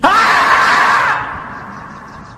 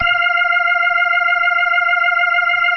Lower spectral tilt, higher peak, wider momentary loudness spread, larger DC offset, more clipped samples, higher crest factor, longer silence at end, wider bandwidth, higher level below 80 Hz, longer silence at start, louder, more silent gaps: about the same, -2.5 dB/octave vs -2.5 dB/octave; first, 0 dBFS vs -4 dBFS; first, 21 LU vs 0 LU; neither; neither; about the same, 14 dB vs 10 dB; about the same, 0 s vs 0 s; first, 14.5 kHz vs 6 kHz; first, -44 dBFS vs -54 dBFS; about the same, 0 s vs 0 s; first, -10 LUFS vs -13 LUFS; neither